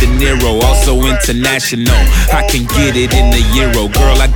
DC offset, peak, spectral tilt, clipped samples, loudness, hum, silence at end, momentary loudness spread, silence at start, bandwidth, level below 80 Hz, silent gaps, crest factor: under 0.1%; 0 dBFS; -4.5 dB/octave; under 0.1%; -11 LUFS; none; 0 s; 2 LU; 0 s; 19 kHz; -12 dBFS; none; 10 dB